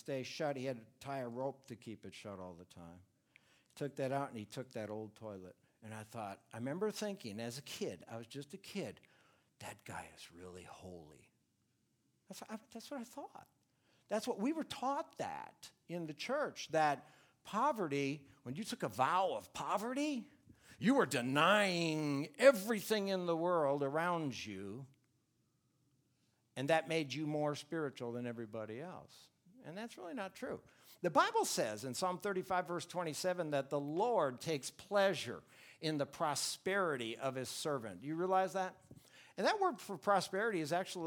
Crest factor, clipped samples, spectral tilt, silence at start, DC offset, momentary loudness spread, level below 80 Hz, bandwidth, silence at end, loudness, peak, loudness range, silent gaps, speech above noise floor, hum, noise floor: 24 dB; under 0.1%; -4.5 dB/octave; 0.05 s; under 0.1%; 18 LU; -82 dBFS; over 20 kHz; 0 s; -38 LUFS; -16 dBFS; 15 LU; none; 41 dB; none; -80 dBFS